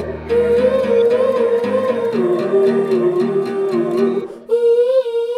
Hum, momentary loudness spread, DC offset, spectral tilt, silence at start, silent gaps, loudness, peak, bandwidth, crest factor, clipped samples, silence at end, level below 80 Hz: none; 5 LU; under 0.1%; -7 dB/octave; 0 s; none; -16 LUFS; -4 dBFS; 10.5 kHz; 12 dB; under 0.1%; 0 s; -46 dBFS